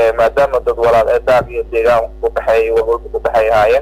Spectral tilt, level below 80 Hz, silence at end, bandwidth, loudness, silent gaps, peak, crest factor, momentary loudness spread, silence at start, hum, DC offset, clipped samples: -5.5 dB/octave; -32 dBFS; 0 s; 16 kHz; -13 LUFS; none; -4 dBFS; 8 dB; 6 LU; 0 s; none; under 0.1%; under 0.1%